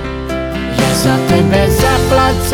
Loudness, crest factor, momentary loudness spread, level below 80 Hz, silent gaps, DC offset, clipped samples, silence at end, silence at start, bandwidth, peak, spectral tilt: -12 LUFS; 12 dB; 8 LU; -24 dBFS; none; under 0.1%; under 0.1%; 0 s; 0 s; 19 kHz; 0 dBFS; -5 dB/octave